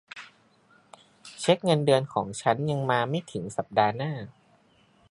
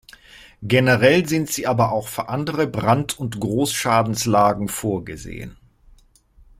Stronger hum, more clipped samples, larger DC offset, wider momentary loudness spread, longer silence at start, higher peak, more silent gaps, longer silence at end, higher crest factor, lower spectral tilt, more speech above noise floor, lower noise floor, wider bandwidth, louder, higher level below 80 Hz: neither; neither; neither; about the same, 19 LU vs 17 LU; second, 0.15 s vs 0.4 s; second, -6 dBFS vs -2 dBFS; neither; second, 0.8 s vs 1.05 s; about the same, 22 dB vs 18 dB; about the same, -5.5 dB/octave vs -5 dB/octave; about the same, 36 dB vs 33 dB; first, -62 dBFS vs -53 dBFS; second, 11.5 kHz vs 16.5 kHz; second, -26 LUFS vs -20 LUFS; second, -66 dBFS vs -48 dBFS